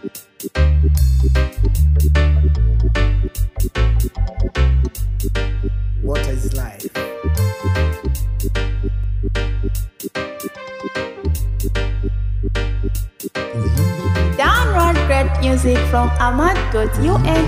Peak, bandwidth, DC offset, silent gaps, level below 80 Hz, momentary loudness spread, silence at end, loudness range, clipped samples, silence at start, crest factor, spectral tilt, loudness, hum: -2 dBFS; 16 kHz; under 0.1%; none; -20 dBFS; 11 LU; 0 s; 7 LU; under 0.1%; 0.05 s; 14 dB; -6 dB/octave; -19 LUFS; none